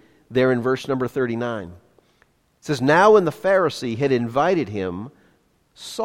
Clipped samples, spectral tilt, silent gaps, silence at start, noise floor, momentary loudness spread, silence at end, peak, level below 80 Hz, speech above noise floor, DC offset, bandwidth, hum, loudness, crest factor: under 0.1%; -6 dB/octave; none; 0.3 s; -62 dBFS; 19 LU; 0 s; -2 dBFS; -58 dBFS; 42 dB; under 0.1%; 14.5 kHz; none; -20 LUFS; 20 dB